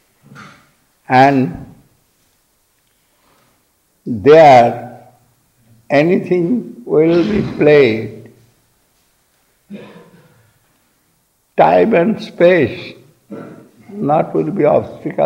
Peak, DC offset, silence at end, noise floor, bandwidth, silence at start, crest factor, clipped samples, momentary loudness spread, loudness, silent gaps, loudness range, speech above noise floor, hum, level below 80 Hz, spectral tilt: 0 dBFS; under 0.1%; 0 s; -60 dBFS; 10 kHz; 0.4 s; 14 dB; under 0.1%; 24 LU; -12 LUFS; none; 6 LU; 49 dB; none; -50 dBFS; -7.5 dB/octave